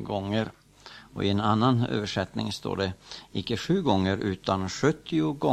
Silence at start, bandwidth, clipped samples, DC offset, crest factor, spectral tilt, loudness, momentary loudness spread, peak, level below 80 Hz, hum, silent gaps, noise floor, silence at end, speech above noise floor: 0 s; 13.5 kHz; under 0.1%; under 0.1%; 18 dB; -6 dB/octave; -27 LUFS; 12 LU; -8 dBFS; -56 dBFS; none; none; -49 dBFS; 0 s; 23 dB